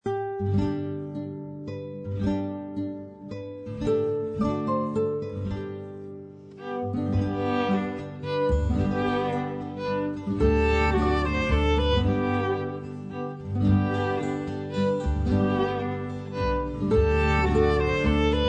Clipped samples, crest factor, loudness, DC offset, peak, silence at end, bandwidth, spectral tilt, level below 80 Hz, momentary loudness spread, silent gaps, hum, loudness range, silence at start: under 0.1%; 16 dB; -26 LUFS; under 0.1%; -10 dBFS; 0 s; 8.8 kHz; -7.5 dB/octave; -34 dBFS; 13 LU; none; none; 6 LU; 0.05 s